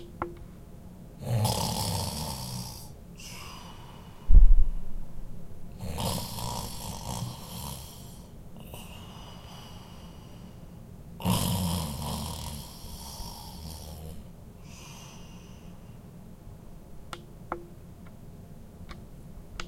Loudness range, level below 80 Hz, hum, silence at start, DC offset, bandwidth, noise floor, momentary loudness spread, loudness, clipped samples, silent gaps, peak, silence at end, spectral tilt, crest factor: 15 LU; -32 dBFS; none; 0 s; under 0.1%; 16 kHz; -47 dBFS; 20 LU; -33 LUFS; under 0.1%; none; -6 dBFS; 0 s; -4.5 dB/octave; 22 dB